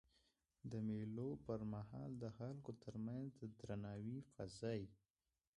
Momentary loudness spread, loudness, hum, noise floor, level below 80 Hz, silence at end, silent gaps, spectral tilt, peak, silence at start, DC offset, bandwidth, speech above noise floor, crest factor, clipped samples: 7 LU; -50 LUFS; none; under -90 dBFS; -72 dBFS; 0.6 s; none; -8 dB/octave; -32 dBFS; 0.65 s; under 0.1%; 11 kHz; over 41 dB; 18 dB; under 0.1%